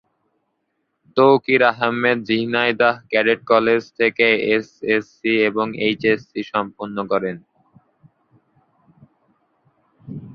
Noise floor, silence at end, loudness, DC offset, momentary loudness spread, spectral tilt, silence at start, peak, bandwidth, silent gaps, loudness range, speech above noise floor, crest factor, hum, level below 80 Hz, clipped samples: -72 dBFS; 0 s; -18 LUFS; under 0.1%; 10 LU; -6.5 dB/octave; 1.15 s; 0 dBFS; 6.6 kHz; none; 11 LU; 54 dB; 20 dB; none; -62 dBFS; under 0.1%